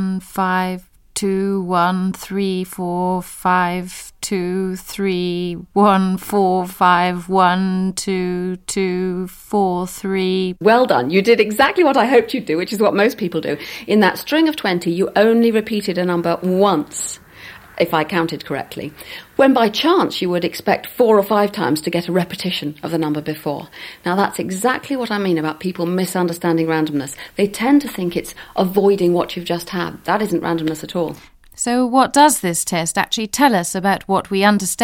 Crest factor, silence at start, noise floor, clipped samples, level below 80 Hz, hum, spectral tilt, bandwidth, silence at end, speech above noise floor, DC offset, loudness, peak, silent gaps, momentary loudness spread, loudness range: 18 dB; 0 s; -39 dBFS; under 0.1%; -52 dBFS; none; -4.5 dB/octave; 17 kHz; 0 s; 22 dB; under 0.1%; -18 LUFS; 0 dBFS; none; 10 LU; 5 LU